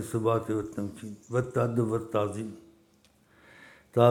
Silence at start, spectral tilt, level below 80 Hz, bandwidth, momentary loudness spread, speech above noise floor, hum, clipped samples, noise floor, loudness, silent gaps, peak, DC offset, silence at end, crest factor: 0 s; -7.5 dB/octave; -64 dBFS; 16 kHz; 12 LU; 34 dB; none; under 0.1%; -63 dBFS; -30 LUFS; none; -6 dBFS; under 0.1%; 0 s; 22 dB